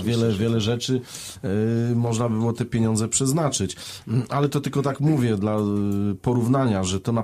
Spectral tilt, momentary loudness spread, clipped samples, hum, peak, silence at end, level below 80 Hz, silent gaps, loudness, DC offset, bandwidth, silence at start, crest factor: -5.5 dB/octave; 6 LU; under 0.1%; none; -8 dBFS; 0 s; -52 dBFS; none; -23 LUFS; under 0.1%; 15 kHz; 0 s; 14 dB